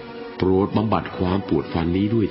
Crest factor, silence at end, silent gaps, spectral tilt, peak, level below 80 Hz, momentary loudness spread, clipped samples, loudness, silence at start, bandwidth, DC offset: 18 dB; 0 s; none; -12.5 dB/octave; -4 dBFS; -38 dBFS; 4 LU; under 0.1%; -22 LUFS; 0 s; 5.8 kHz; under 0.1%